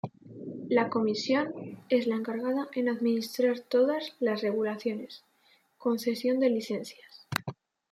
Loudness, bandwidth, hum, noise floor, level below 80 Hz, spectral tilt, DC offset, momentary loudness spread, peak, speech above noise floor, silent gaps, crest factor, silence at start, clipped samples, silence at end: -29 LUFS; 16.5 kHz; none; -66 dBFS; -78 dBFS; -5.5 dB/octave; under 0.1%; 16 LU; -8 dBFS; 38 dB; none; 22 dB; 0.05 s; under 0.1%; 0.4 s